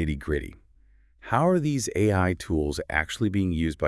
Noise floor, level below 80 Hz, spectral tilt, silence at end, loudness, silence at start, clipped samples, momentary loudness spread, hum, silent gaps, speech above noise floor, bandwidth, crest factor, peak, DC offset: -58 dBFS; -42 dBFS; -6 dB/octave; 0 s; -26 LUFS; 0 s; under 0.1%; 7 LU; none; none; 33 dB; 12 kHz; 20 dB; -6 dBFS; under 0.1%